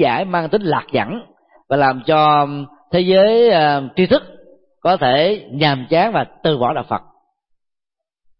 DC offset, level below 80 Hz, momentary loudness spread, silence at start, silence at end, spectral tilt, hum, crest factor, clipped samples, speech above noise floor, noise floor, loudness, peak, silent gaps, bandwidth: under 0.1%; -52 dBFS; 10 LU; 0 s; 1.4 s; -11 dB/octave; none; 14 dB; under 0.1%; 68 dB; -83 dBFS; -16 LUFS; -2 dBFS; none; 5.8 kHz